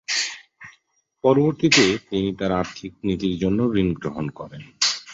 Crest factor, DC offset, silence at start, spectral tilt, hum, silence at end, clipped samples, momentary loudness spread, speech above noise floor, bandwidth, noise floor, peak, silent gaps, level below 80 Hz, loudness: 20 dB; under 0.1%; 0.1 s; -4 dB/octave; none; 0 s; under 0.1%; 15 LU; 42 dB; 8.2 kHz; -64 dBFS; -2 dBFS; none; -48 dBFS; -21 LUFS